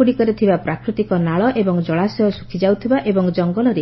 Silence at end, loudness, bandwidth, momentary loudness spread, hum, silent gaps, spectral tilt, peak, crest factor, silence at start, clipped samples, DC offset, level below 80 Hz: 0 s; -18 LUFS; 6 kHz; 4 LU; none; none; -9.5 dB/octave; -2 dBFS; 14 dB; 0 s; under 0.1%; under 0.1%; -48 dBFS